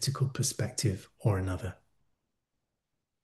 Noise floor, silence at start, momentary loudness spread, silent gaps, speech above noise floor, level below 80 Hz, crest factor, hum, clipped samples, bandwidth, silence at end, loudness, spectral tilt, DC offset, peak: -85 dBFS; 0 s; 7 LU; none; 54 dB; -60 dBFS; 20 dB; none; under 0.1%; 12.5 kHz; 1.5 s; -32 LUFS; -4.5 dB/octave; under 0.1%; -14 dBFS